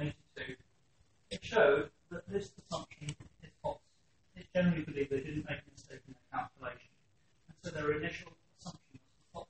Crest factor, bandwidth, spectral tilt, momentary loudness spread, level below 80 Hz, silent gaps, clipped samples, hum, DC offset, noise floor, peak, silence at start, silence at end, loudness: 24 dB; 8.4 kHz; -6 dB/octave; 22 LU; -64 dBFS; none; under 0.1%; none; under 0.1%; -74 dBFS; -16 dBFS; 0 s; 0.05 s; -37 LUFS